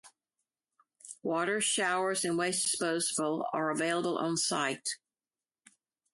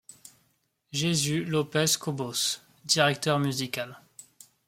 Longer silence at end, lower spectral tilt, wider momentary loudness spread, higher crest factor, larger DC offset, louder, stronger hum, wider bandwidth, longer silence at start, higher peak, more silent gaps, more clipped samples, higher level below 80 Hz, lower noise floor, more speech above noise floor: first, 1.2 s vs 0.45 s; about the same, -2.5 dB/octave vs -3.5 dB/octave; second, 8 LU vs 11 LU; second, 16 dB vs 22 dB; neither; second, -31 LUFS vs -27 LUFS; neither; second, 12 kHz vs 16.5 kHz; second, 0.05 s vs 0.25 s; second, -16 dBFS vs -8 dBFS; neither; neither; second, -80 dBFS vs -66 dBFS; first, under -90 dBFS vs -72 dBFS; first, over 59 dB vs 45 dB